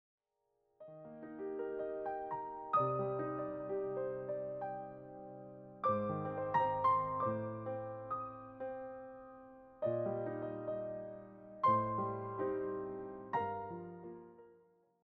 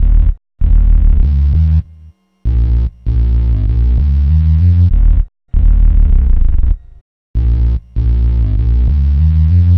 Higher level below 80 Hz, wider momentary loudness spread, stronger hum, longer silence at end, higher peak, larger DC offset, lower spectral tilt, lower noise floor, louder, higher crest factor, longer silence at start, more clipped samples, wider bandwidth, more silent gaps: second, -72 dBFS vs -10 dBFS; first, 19 LU vs 7 LU; neither; first, 0.5 s vs 0 s; second, -22 dBFS vs 0 dBFS; neither; second, -7 dB/octave vs -11 dB/octave; first, -83 dBFS vs -40 dBFS; second, -39 LUFS vs -14 LUFS; first, 18 dB vs 10 dB; first, 0.8 s vs 0 s; neither; first, 5.8 kHz vs 3 kHz; second, none vs 7.01-7.34 s